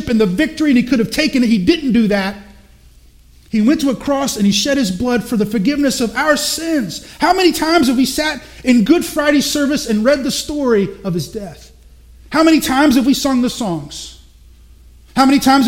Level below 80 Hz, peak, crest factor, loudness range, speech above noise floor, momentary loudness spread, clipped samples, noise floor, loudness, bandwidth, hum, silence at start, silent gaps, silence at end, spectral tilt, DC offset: -40 dBFS; 0 dBFS; 16 dB; 2 LU; 31 dB; 10 LU; under 0.1%; -45 dBFS; -15 LUFS; 16.5 kHz; none; 0 s; none; 0 s; -4.5 dB/octave; under 0.1%